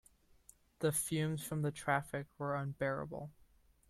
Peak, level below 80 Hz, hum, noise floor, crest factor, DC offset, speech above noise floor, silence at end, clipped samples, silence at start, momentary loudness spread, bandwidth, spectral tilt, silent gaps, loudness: -18 dBFS; -68 dBFS; none; -66 dBFS; 20 dB; under 0.1%; 28 dB; 0.6 s; under 0.1%; 0.8 s; 10 LU; 15.5 kHz; -5 dB/octave; none; -38 LUFS